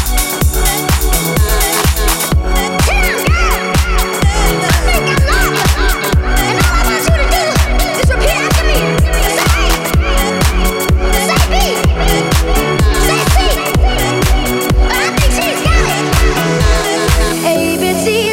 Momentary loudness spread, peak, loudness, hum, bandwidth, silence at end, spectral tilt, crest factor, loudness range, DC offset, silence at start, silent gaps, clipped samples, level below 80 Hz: 2 LU; 0 dBFS; -12 LUFS; none; 16.5 kHz; 0 s; -4 dB/octave; 12 dB; 0 LU; under 0.1%; 0 s; none; under 0.1%; -14 dBFS